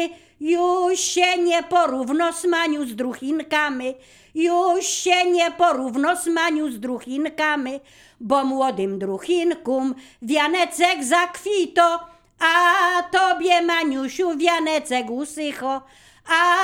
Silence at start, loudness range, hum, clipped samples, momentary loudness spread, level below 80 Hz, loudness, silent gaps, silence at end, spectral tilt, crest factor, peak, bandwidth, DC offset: 0 s; 4 LU; none; under 0.1%; 10 LU; -62 dBFS; -20 LUFS; none; 0 s; -2 dB/octave; 18 dB; -2 dBFS; 16.5 kHz; under 0.1%